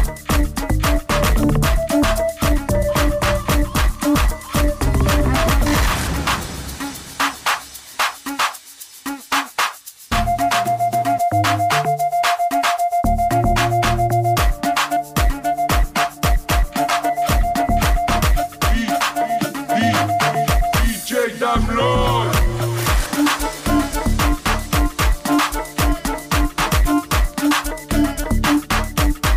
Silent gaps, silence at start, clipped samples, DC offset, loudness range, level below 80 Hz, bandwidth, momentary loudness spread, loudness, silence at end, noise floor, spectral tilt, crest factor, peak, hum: none; 0 s; under 0.1%; under 0.1%; 3 LU; -22 dBFS; 16 kHz; 4 LU; -19 LUFS; 0 s; -39 dBFS; -4.5 dB/octave; 12 dB; -6 dBFS; none